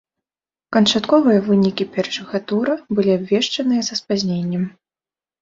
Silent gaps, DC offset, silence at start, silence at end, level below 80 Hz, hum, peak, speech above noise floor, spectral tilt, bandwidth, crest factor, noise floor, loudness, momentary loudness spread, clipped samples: none; under 0.1%; 0.7 s; 0.7 s; -60 dBFS; none; -2 dBFS; over 72 dB; -5.5 dB/octave; 7.8 kHz; 18 dB; under -90 dBFS; -18 LUFS; 9 LU; under 0.1%